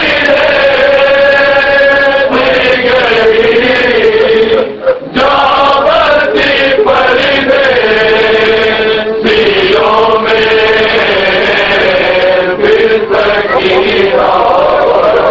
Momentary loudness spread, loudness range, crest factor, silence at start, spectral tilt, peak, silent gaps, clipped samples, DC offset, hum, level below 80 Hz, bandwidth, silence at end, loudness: 3 LU; 1 LU; 8 dB; 0 s; -5 dB/octave; 0 dBFS; none; under 0.1%; under 0.1%; none; -36 dBFS; 7.6 kHz; 0 s; -7 LUFS